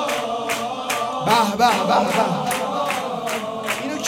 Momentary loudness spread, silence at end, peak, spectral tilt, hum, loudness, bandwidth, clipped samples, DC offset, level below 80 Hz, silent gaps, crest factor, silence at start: 8 LU; 0 s; -4 dBFS; -3.5 dB/octave; none; -21 LUFS; 16.5 kHz; under 0.1%; under 0.1%; -58 dBFS; none; 18 dB; 0 s